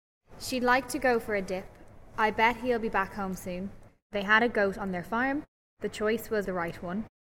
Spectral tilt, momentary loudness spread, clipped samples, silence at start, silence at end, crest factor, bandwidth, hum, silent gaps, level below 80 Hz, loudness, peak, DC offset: -4.5 dB/octave; 13 LU; under 0.1%; 0.3 s; 0.15 s; 20 dB; 16 kHz; none; 4.02-4.10 s, 5.48-5.77 s; -52 dBFS; -29 LUFS; -10 dBFS; under 0.1%